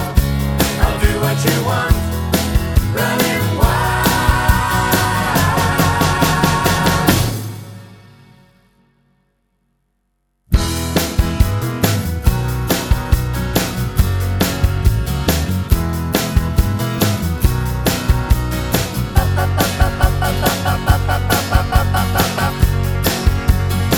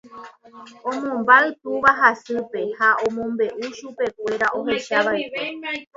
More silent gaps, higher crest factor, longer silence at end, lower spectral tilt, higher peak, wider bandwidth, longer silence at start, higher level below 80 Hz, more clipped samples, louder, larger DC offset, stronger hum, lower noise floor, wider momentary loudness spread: neither; second, 16 dB vs 22 dB; about the same, 0 s vs 0.1 s; about the same, -5 dB/octave vs -4 dB/octave; about the same, 0 dBFS vs 0 dBFS; first, over 20 kHz vs 7.8 kHz; about the same, 0 s vs 0.1 s; first, -22 dBFS vs -62 dBFS; neither; first, -16 LUFS vs -20 LUFS; neither; neither; first, -67 dBFS vs -42 dBFS; second, 4 LU vs 13 LU